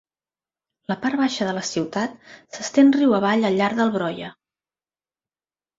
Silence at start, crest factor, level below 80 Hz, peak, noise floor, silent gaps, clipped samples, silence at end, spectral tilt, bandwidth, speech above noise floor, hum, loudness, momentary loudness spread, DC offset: 0.9 s; 18 dB; -66 dBFS; -6 dBFS; under -90 dBFS; none; under 0.1%; 1.45 s; -5 dB/octave; 7.8 kHz; over 69 dB; none; -21 LUFS; 17 LU; under 0.1%